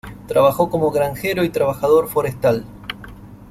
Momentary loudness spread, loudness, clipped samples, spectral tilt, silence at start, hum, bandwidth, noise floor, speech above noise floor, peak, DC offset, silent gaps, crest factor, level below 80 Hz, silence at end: 16 LU; -18 LUFS; under 0.1%; -6 dB/octave; 0.05 s; 50 Hz at -45 dBFS; 16 kHz; -38 dBFS; 21 dB; -2 dBFS; under 0.1%; none; 16 dB; -46 dBFS; 0.05 s